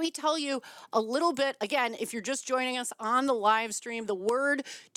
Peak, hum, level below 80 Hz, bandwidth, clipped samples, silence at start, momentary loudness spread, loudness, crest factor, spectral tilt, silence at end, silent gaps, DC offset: -12 dBFS; none; -82 dBFS; 17 kHz; under 0.1%; 0 s; 8 LU; -29 LUFS; 18 dB; -2 dB/octave; 0.15 s; none; under 0.1%